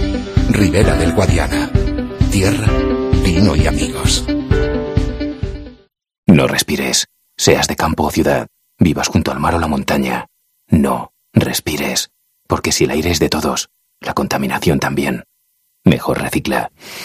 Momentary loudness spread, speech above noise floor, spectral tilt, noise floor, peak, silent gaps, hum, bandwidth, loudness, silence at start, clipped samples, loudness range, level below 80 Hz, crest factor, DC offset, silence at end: 9 LU; 48 dB; -5 dB/octave; -63 dBFS; 0 dBFS; 6.18-6.23 s; none; 15.5 kHz; -16 LUFS; 0 s; under 0.1%; 3 LU; -26 dBFS; 16 dB; under 0.1%; 0 s